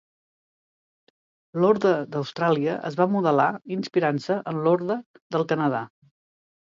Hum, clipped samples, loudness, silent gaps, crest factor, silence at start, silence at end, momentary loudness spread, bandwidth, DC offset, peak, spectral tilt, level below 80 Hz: none; under 0.1%; -24 LUFS; 5.06-5.14 s, 5.21-5.30 s; 18 dB; 1.55 s; 0.9 s; 10 LU; 7.6 kHz; under 0.1%; -6 dBFS; -7.5 dB/octave; -74 dBFS